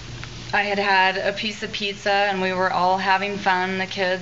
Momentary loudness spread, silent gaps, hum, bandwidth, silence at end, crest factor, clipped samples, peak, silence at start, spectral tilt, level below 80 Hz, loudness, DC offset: 8 LU; none; none; 8 kHz; 0 s; 18 dB; under 0.1%; -4 dBFS; 0 s; -1.5 dB/octave; -50 dBFS; -21 LUFS; 0.4%